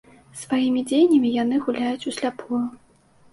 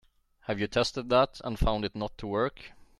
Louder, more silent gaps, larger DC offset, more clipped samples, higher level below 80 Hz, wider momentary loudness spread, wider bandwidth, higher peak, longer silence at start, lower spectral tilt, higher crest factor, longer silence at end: first, -22 LUFS vs -30 LUFS; neither; neither; neither; second, -64 dBFS vs -40 dBFS; about the same, 12 LU vs 11 LU; second, 11.5 kHz vs 13 kHz; first, -8 dBFS vs -12 dBFS; second, 0.35 s vs 0.5 s; about the same, -4.5 dB/octave vs -5.5 dB/octave; about the same, 14 dB vs 18 dB; first, 0.55 s vs 0.3 s